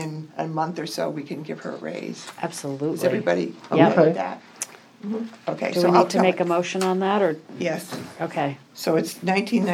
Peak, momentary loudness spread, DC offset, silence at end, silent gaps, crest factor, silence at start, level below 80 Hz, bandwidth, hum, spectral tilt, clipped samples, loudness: -2 dBFS; 15 LU; under 0.1%; 0 s; none; 22 dB; 0 s; -78 dBFS; 16.5 kHz; none; -5.5 dB/octave; under 0.1%; -24 LUFS